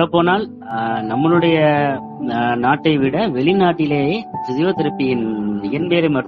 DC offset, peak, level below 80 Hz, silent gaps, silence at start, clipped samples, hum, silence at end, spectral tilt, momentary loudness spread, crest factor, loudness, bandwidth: under 0.1%; -2 dBFS; -52 dBFS; none; 0 s; under 0.1%; none; 0 s; -5 dB/octave; 8 LU; 16 dB; -17 LUFS; 6 kHz